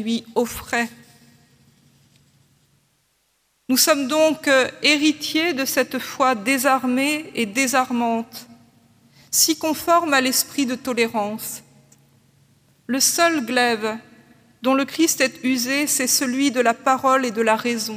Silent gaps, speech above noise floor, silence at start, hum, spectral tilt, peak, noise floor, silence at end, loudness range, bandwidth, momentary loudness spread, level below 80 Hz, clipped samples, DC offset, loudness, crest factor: none; 46 dB; 0 s; none; -1.5 dB/octave; -2 dBFS; -66 dBFS; 0 s; 4 LU; 16.5 kHz; 9 LU; -62 dBFS; under 0.1%; under 0.1%; -19 LUFS; 20 dB